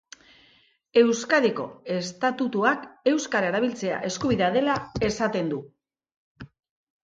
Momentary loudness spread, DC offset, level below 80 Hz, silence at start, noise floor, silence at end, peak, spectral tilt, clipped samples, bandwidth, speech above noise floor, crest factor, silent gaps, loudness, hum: 9 LU; under 0.1%; -56 dBFS; 0.95 s; -61 dBFS; 0.6 s; -6 dBFS; -4.5 dB/octave; under 0.1%; 9.2 kHz; 37 dB; 20 dB; 6.16-6.35 s; -25 LUFS; none